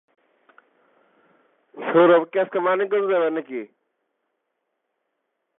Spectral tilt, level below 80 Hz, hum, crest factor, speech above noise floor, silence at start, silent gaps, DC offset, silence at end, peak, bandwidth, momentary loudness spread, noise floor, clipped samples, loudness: -10 dB/octave; -90 dBFS; none; 20 dB; 58 dB; 1.75 s; none; under 0.1%; 1.95 s; -4 dBFS; 3.9 kHz; 17 LU; -77 dBFS; under 0.1%; -20 LUFS